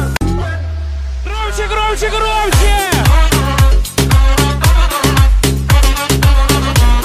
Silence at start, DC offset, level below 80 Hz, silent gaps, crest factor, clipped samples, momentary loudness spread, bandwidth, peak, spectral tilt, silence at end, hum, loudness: 0 s; under 0.1%; -12 dBFS; none; 10 dB; under 0.1%; 9 LU; 16 kHz; 0 dBFS; -4.5 dB/octave; 0 s; none; -13 LUFS